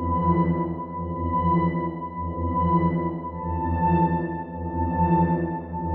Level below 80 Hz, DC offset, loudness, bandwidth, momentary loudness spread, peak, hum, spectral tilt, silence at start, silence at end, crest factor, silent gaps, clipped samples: -38 dBFS; under 0.1%; -25 LUFS; 3.7 kHz; 9 LU; -8 dBFS; none; -9.5 dB/octave; 0 s; 0 s; 14 dB; none; under 0.1%